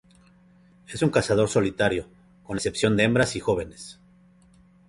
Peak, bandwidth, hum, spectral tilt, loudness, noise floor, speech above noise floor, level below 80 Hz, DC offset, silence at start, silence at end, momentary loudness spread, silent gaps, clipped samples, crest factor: -6 dBFS; 11.5 kHz; none; -5 dB/octave; -24 LUFS; -56 dBFS; 32 dB; -50 dBFS; under 0.1%; 0.9 s; 0.95 s; 17 LU; none; under 0.1%; 20 dB